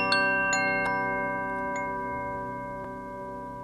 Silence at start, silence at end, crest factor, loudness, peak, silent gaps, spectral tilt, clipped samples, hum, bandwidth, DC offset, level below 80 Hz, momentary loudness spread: 0 s; 0 s; 20 dB; -29 LUFS; -10 dBFS; none; -3.5 dB/octave; under 0.1%; none; 14 kHz; under 0.1%; -54 dBFS; 14 LU